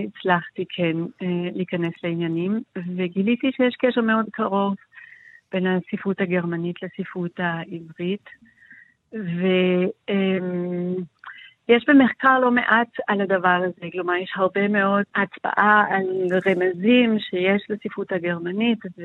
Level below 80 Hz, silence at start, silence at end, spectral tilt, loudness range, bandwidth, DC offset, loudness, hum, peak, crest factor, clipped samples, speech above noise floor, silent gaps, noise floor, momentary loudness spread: -70 dBFS; 0 s; 0 s; -8.5 dB/octave; 7 LU; 4.2 kHz; under 0.1%; -22 LUFS; none; -2 dBFS; 20 dB; under 0.1%; 29 dB; none; -51 dBFS; 13 LU